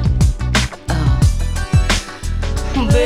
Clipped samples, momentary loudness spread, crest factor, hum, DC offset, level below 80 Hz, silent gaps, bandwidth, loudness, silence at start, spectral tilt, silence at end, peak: under 0.1%; 7 LU; 14 dB; none; under 0.1%; -18 dBFS; none; 14 kHz; -17 LUFS; 0 s; -5.5 dB/octave; 0 s; -2 dBFS